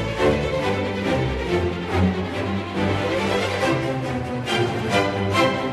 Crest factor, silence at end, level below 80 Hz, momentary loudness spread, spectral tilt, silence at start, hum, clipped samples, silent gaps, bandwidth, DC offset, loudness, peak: 16 dB; 0 s; -36 dBFS; 5 LU; -6 dB/octave; 0 s; none; under 0.1%; none; 13 kHz; under 0.1%; -22 LUFS; -6 dBFS